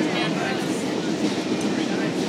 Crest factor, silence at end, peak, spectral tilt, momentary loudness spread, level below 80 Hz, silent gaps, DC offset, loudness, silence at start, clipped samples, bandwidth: 14 dB; 0 s; -10 dBFS; -4.5 dB/octave; 2 LU; -64 dBFS; none; under 0.1%; -24 LUFS; 0 s; under 0.1%; 15 kHz